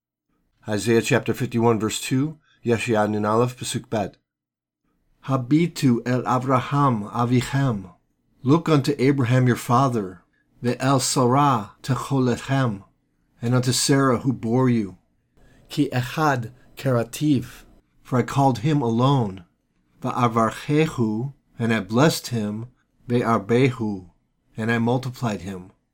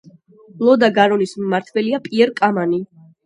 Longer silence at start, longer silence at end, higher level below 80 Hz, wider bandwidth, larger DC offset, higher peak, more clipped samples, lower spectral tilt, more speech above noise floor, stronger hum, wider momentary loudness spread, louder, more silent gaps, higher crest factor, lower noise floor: about the same, 0.65 s vs 0.55 s; second, 0.25 s vs 0.4 s; first, -54 dBFS vs -66 dBFS; first, 18 kHz vs 11 kHz; neither; second, -6 dBFS vs 0 dBFS; neither; about the same, -6 dB/octave vs -6 dB/octave; first, 67 dB vs 30 dB; neither; first, 11 LU vs 8 LU; second, -22 LUFS vs -17 LUFS; neither; about the same, 18 dB vs 16 dB; first, -88 dBFS vs -46 dBFS